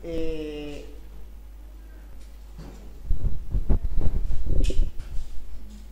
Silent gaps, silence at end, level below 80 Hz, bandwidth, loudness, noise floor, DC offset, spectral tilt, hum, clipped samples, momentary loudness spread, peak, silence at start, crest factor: none; 0.05 s; -28 dBFS; 7.6 kHz; -32 LUFS; -42 dBFS; under 0.1%; -7 dB/octave; none; under 0.1%; 18 LU; -6 dBFS; 0 s; 16 dB